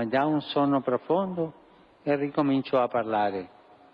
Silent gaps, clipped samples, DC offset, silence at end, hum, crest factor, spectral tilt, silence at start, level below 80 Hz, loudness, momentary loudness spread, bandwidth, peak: none; under 0.1%; under 0.1%; 0.45 s; none; 14 dB; -9 dB/octave; 0 s; -68 dBFS; -27 LUFS; 10 LU; 5.4 kHz; -12 dBFS